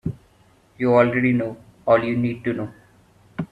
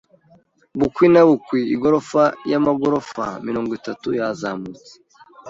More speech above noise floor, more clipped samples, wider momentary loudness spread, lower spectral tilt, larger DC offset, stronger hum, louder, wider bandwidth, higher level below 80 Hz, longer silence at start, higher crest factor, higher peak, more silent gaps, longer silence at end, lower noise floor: about the same, 37 dB vs 37 dB; neither; about the same, 16 LU vs 14 LU; first, -9 dB/octave vs -7 dB/octave; neither; neither; about the same, -21 LUFS vs -19 LUFS; about the same, 7.2 kHz vs 7.8 kHz; about the same, -54 dBFS vs -56 dBFS; second, 0.05 s vs 0.75 s; about the same, 18 dB vs 18 dB; about the same, -4 dBFS vs -2 dBFS; neither; about the same, 0.05 s vs 0 s; about the same, -56 dBFS vs -55 dBFS